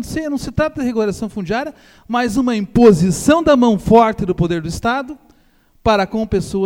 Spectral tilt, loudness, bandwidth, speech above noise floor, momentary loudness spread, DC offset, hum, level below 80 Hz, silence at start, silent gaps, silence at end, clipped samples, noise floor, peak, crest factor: -6 dB/octave; -16 LUFS; 16.5 kHz; 38 dB; 11 LU; under 0.1%; none; -38 dBFS; 0 s; none; 0 s; under 0.1%; -53 dBFS; 0 dBFS; 16 dB